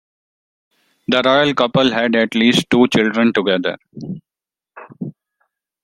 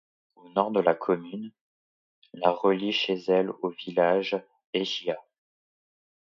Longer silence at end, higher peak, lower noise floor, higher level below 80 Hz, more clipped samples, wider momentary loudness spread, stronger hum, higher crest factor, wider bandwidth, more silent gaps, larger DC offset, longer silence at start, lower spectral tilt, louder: second, 0.75 s vs 1.15 s; first, 0 dBFS vs -6 dBFS; about the same, -89 dBFS vs under -90 dBFS; first, -56 dBFS vs -78 dBFS; neither; first, 18 LU vs 10 LU; neither; about the same, 18 dB vs 22 dB; first, 13 kHz vs 7.2 kHz; second, none vs 1.61-2.22 s, 4.66-4.73 s; neither; first, 1.1 s vs 0.55 s; about the same, -5 dB/octave vs -5.5 dB/octave; first, -15 LUFS vs -27 LUFS